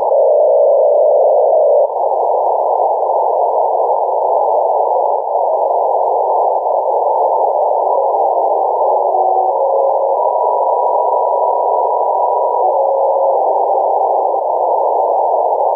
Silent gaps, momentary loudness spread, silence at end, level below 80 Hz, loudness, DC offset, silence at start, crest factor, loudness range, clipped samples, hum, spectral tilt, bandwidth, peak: none; 4 LU; 0 s; -76 dBFS; -13 LUFS; under 0.1%; 0 s; 10 dB; 2 LU; under 0.1%; none; -7.5 dB/octave; 1.2 kHz; -4 dBFS